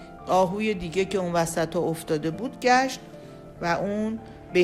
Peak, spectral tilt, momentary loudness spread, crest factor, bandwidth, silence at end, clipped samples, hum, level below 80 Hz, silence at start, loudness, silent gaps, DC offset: -8 dBFS; -5 dB/octave; 14 LU; 18 dB; 15.5 kHz; 0 s; under 0.1%; none; -52 dBFS; 0 s; -26 LUFS; none; under 0.1%